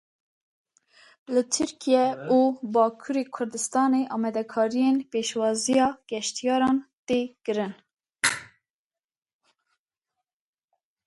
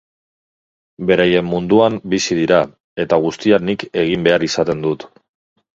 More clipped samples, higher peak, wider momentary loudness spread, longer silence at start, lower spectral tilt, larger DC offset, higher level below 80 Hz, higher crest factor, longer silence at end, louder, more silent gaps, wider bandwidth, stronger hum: neither; second, -8 dBFS vs 0 dBFS; about the same, 7 LU vs 8 LU; first, 1.3 s vs 1 s; second, -3 dB/octave vs -5 dB/octave; neither; second, -68 dBFS vs -50 dBFS; about the same, 18 dB vs 18 dB; first, 2.6 s vs 0.7 s; second, -25 LUFS vs -16 LUFS; about the same, 6.93-7.05 s, 7.93-7.97 s vs 2.80-2.96 s; first, 11.5 kHz vs 7.8 kHz; neither